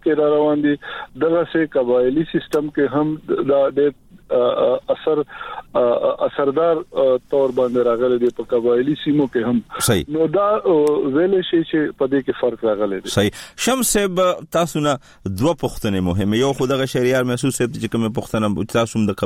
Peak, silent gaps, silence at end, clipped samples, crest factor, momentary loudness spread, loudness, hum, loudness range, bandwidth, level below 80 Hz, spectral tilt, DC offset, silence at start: -4 dBFS; none; 0 s; under 0.1%; 14 dB; 5 LU; -19 LUFS; none; 2 LU; 16.5 kHz; -46 dBFS; -5 dB/octave; under 0.1%; 0.05 s